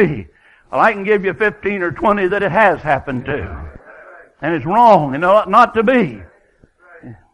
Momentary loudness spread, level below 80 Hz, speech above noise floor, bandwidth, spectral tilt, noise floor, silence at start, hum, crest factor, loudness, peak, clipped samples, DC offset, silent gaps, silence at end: 13 LU; -42 dBFS; 38 dB; 11 kHz; -7.5 dB/octave; -52 dBFS; 0 s; none; 16 dB; -15 LUFS; 0 dBFS; under 0.1%; under 0.1%; none; 0.2 s